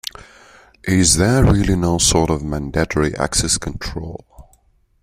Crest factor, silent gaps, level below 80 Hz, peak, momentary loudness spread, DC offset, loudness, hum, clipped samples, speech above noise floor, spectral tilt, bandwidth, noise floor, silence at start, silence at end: 18 dB; none; -30 dBFS; 0 dBFS; 17 LU; under 0.1%; -17 LUFS; none; under 0.1%; 40 dB; -4 dB/octave; 16 kHz; -57 dBFS; 0.85 s; 0.6 s